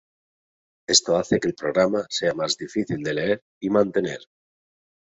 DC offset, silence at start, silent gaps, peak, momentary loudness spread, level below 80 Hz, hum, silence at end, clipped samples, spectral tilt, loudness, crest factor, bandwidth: under 0.1%; 0.9 s; 3.42-3.61 s; -4 dBFS; 8 LU; -60 dBFS; none; 0.85 s; under 0.1%; -3 dB/octave; -23 LUFS; 22 dB; 8.4 kHz